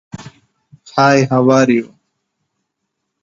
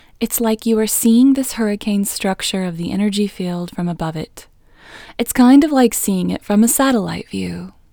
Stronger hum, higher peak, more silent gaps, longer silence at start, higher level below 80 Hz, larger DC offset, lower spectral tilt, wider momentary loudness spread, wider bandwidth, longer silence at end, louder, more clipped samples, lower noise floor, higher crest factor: neither; about the same, 0 dBFS vs 0 dBFS; neither; about the same, 0.15 s vs 0.2 s; second, -56 dBFS vs -46 dBFS; neither; first, -6 dB/octave vs -4.5 dB/octave; first, 23 LU vs 13 LU; second, 7.6 kHz vs over 20 kHz; first, 1.35 s vs 0.25 s; first, -13 LUFS vs -16 LUFS; neither; first, -74 dBFS vs -42 dBFS; about the same, 16 dB vs 16 dB